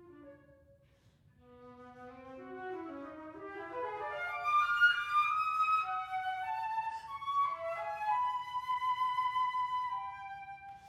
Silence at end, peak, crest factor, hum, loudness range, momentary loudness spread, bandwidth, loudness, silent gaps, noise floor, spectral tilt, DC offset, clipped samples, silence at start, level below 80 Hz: 0 s; -18 dBFS; 18 dB; none; 16 LU; 18 LU; 15 kHz; -34 LUFS; none; -66 dBFS; -3 dB/octave; under 0.1%; under 0.1%; 0 s; -74 dBFS